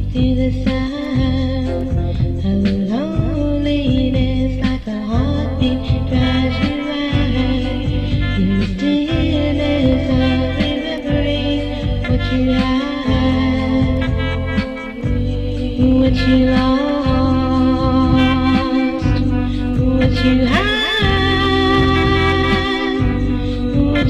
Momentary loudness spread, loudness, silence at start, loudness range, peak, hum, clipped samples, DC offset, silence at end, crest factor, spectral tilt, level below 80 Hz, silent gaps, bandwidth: 6 LU; -17 LUFS; 0 s; 3 LU; -4 dBFS; none; under 0.1%; under 0.1%; 0 s; 12 dB; -7.5 dB/octave; -24 dBFS; none; 8.4 kHz